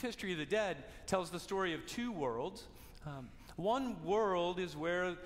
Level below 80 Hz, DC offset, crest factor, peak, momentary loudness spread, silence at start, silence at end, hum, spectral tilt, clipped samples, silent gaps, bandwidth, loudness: -60 dBFS; under 0.1%; 18 dB; -22 dBFS; 14 LU; 0 s; 0 s; none; -5 dB/octave; under 0.1%; none; 16 kHz; -38 LUFS